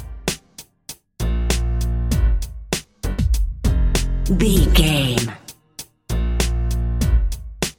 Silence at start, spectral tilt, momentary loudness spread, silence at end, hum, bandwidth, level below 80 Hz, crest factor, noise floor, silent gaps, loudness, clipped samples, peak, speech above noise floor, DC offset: 0 s; -5 dB/octave; 21 LU; 0.05 s; none; 17 kHz; -20 dBFS; 18 dB; -45 dBFS; none; -21 LUFS; under 0.1%; -2 dBFS; 29 dB; under 0.1%